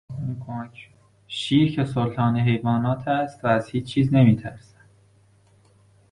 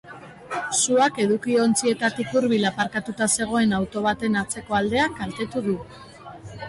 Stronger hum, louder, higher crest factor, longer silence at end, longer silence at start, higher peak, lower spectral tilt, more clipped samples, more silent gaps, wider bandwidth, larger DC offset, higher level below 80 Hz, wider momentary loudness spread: neither; about the same, -22 LUFS vs -23 LUFS; about the same, 18 dB vs 16 dB; first, 1.55 s vs 0 s; about the same, 0.1 s vs 0.05 s; first, -4 dBFS vs -8 dBFS; first, -7.5 dB/octave vs -3.5 dB/octave; neither; neither; about the same, 10.5 kHz vs 11.5 kHz; neither; about the same, -52 dBFS vs -52 dBFS; second, 16 LU vs 19 LU